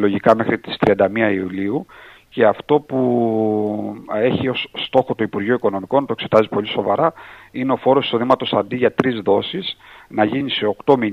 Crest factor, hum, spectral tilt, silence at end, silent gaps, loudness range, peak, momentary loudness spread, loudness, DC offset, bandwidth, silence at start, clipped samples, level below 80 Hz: 18 dB; none; -7.5 dB/octave; 0 s; none; 1 LU; 0 dBFS; 9 LU; -18 LUFS; under 0.1%; 7.8 kHz; 0 s; under 0.1%; -56 dBFS